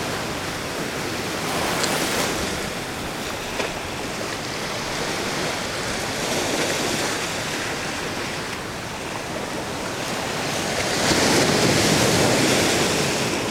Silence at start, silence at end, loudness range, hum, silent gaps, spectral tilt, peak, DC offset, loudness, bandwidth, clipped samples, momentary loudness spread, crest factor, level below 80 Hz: 0 s; 0 s; 7 LU; none; none; -3 dB/octave; -4 dBFS; under 0.1%; -22 LUFS; over 20 kHz; under 0.1%; 10 LU; 18 dB; -46 dBFS